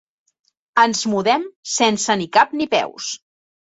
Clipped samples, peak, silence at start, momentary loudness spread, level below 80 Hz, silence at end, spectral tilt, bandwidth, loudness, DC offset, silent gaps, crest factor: under 0.1%; -2 dBFS; 0.75 s; 10 LU; -66 dBFS; 0.6 s; -2.5 dB/octave; 8.2 kHz; -18 LUFS; under 0.1%; 1.56-1.63 s; 18 dB